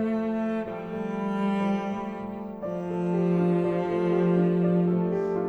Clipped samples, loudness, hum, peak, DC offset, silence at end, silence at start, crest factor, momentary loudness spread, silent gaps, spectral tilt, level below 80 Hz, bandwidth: under 0.1%; -27 LUFS; none; -12 dBFS; under 0.1%; 0 s; 0 s; 14 dB; 10 LU; none; -9.5 dB/octave; -60 dBFS; 6.2 kHz